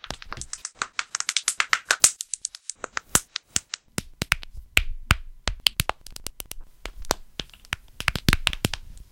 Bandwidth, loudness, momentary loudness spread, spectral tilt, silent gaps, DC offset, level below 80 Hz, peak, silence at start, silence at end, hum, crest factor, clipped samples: 17 kHz; -25 LUFS; 15 LU; -1.5 dB/octave; none; under 0.1%; -38 dBFS; 0 dBFS; 0.05 s; 0.1 s; none; 28 dB; under 0.1%